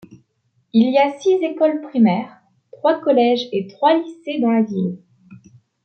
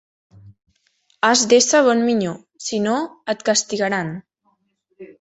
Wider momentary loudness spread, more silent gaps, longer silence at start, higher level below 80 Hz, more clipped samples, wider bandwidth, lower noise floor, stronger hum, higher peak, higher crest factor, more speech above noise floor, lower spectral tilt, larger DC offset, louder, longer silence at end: second, 9 LU vs 14 LU; neither; second, 0.1 s vs 0.45 s; second, -70 dBFS vs -64 dBFS; neither; second, 6.6 kHz vs 8.4 kHz; about the same, -66 dBFS vs -67 dBFS; neither; about the same, -4 dBFS vs -2 dBFS; about the same, 14 dB vs 18 dB; about the same, 49 dB vs 49 dB; first, -7 dB/octave vs -3 dB/octave; neither; about the same, -18 LUFS vs -18 LUFS; first, 0.5 s vs 0.15 s